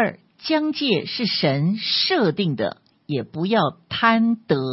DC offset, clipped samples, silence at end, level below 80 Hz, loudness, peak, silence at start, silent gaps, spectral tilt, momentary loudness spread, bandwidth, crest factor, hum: under 0.1%; under 0.1%; 0 s; -64 dBFS; -21 LUFS; -2 dBFS; 0 s; none; -8.5 dB/octave; 10 LU; 6 kHz; 18 dB; none